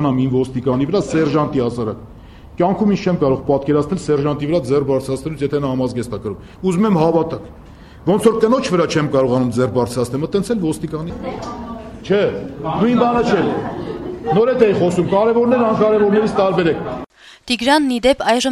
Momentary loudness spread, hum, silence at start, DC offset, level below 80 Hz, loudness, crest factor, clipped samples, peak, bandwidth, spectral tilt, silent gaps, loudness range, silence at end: 12 LU; none; 0 s; under 0.1%; -42 dBFS; -17 LUFS; 16 dB; under 0.1%; -2 dBFS; 13 kHz; -6.5 dB/octave; none; 4 LU; 0 s